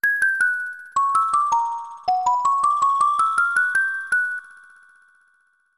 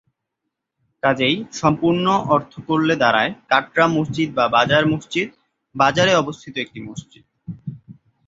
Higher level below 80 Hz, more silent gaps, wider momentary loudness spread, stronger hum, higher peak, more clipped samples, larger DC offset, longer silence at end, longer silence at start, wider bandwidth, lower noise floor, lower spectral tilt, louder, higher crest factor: second, -70 dBFS vs -54 dBFS; neither; second, 8 LU vs 18 LU; neither; second, -8 dBFS vs -2 dBFS; neither; first, 0.2% vs under 0.1%; first, 1.3 s vs 0.35 s; second, 0.05 s vs 1.05 s; first, 12.5 kHz vs 7.8 kHz; second, -63 dBFS vs -79 dBFS; second, 0 dB/octave vs -5 dB/octave; about the same, -20 LUFS vs -18 LUFS; about the same, 14 dB vs 18 dB